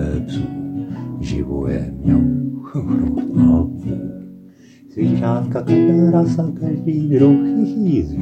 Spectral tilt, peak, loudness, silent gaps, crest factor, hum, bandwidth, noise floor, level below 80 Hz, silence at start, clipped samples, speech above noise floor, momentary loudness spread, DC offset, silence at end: -10 dB/octave; -2 dBFS; -18 LUFS; none; 16 dB; none; 8.2 kHz; -43 dBFS; -34 dBFS; 0 s; under 0.1%; 28 dB; 13 LU; under 0.1%; 0 s